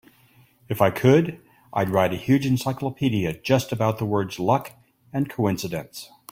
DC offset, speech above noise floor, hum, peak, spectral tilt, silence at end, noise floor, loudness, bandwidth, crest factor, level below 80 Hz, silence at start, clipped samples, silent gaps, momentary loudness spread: under 0.1%; 35 dB; none; -4 dBFS; -6.5 dB/octave; 0.25 s; -57 dBFS; -23 LUFS; 16.5 kHz; 20 dB; -56 dBFS; 0.7 s; under 0.1%; none; 13 LU